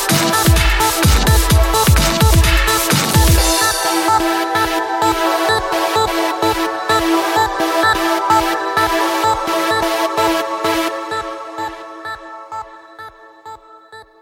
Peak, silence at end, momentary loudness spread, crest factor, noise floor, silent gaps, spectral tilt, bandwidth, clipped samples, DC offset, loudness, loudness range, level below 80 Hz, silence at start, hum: 0 dBFS; 0.2 s; 15 LU; 14 dB; -40 dBFS; none; -4 dB/octave; 17 kHz; under 0.1%; under 0.1%; -14 LUFS; 9 LU; -22 dBFS; 0 s; none